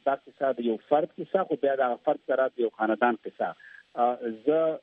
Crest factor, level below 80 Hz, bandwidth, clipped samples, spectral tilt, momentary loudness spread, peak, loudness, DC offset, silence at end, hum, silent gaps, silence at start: 18 dB; -80 dBFS; 4.5 kHz; under 0.1%; -8.5 dB/octave; 7 LU; -10 dBFS; -28 LUFS; under 0.1%; 0.05 s; none; none; 0.05 s